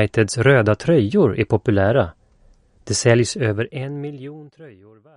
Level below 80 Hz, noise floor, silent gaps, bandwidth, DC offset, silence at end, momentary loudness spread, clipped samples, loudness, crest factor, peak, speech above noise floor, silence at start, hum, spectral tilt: -48 dBFS; -54 dBFS; none; 11 kHz; under 0.1%; 0.45 s; 14 LU; under 0.1%; -18 LUFS; 18 dB; -2 dBFS; 35 dB; 0 s; none; -5.5 dB/octave